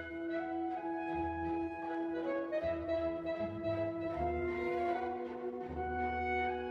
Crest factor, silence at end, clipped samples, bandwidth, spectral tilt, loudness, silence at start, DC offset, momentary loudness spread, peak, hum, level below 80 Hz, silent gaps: 12 dB; 0 s; under 0.1%; 6.4 kHz; -8 dB/octave; -38 LUFS; 0 s; under 0.1%; 4 LU; -24 dBFS; none; -54 dBFS; none